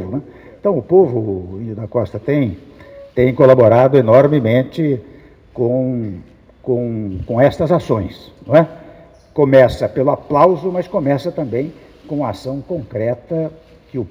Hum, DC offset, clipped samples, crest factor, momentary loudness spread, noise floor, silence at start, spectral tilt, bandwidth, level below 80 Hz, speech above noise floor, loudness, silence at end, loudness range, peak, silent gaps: none; under 0.1%; under 0.1%; 16 dB; 17 LU; -42 dBFS; 0 s; -9 dB/octave; 12.5 kHz; -44 dBFS; 27 dB; -15 LUFS; 0 s; 6 LU; 0 dBFS; none